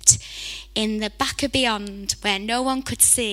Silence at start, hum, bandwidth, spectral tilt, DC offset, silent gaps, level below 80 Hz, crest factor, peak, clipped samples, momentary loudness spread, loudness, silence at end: 0 s; none; 17 kHz; -1.5 dB/octave; under 0.1%; none; -44 dBFS; 22 dB; 0 dBFS; under 0.1%; 11 LU; -21 LUFS; 0 s